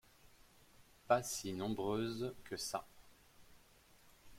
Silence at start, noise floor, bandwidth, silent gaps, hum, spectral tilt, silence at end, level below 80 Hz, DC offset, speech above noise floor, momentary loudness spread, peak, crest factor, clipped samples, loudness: 0.75 s; -66 dBFS; 16.5 kHz; none; none; -4 dB/octave; 0 s; -68 dBFS; under 0.1%; 27 dB; 9 LU; -18 dBFS; 26 dB; under 0.1%; -40 LUFS